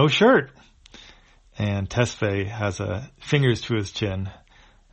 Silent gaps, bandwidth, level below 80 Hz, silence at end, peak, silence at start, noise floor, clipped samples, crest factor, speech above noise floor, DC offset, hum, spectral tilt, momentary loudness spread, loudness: none; 8.4 kHz; -50 dBFS; 0.55 s; -4 dBFS; 0 s; -54 dBFS; under 0.1%; 18 dB; 31 dB; under 0.1%; none; -5.5 dB/octave; 14 LU; -23 LUFS